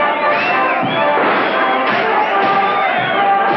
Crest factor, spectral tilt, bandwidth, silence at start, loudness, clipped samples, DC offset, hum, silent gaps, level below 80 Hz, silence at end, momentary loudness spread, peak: 10 dB; -6 dB/octave; 6 kHz; 0 s; -14 LUFS; under 0.1%; under 0.1%; none; none; -60 dBFS; 0 s; 1 LU; -4 dBFS